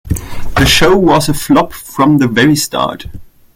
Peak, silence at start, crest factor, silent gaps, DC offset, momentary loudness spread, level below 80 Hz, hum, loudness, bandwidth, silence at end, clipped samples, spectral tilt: 0 dBFS; 0.05 s; 12 dB; none; under 0.1%; 13 LU; -26 dBFS; none; -11 LUFS; 17 kHz; 0.3 s; under 0.1%; -4.5 dB/octave